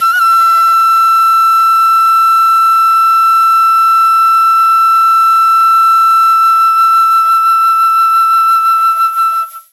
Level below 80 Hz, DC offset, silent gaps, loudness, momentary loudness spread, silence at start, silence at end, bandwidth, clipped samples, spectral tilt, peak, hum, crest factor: under -90 dBFS; under 0.1%; none; -7 LUFS; 1 LU; 0 s; 0.15 s; 15 kHz; under 0.1%; 4.5 dB/octave; -4 dBFS; none; 6 dB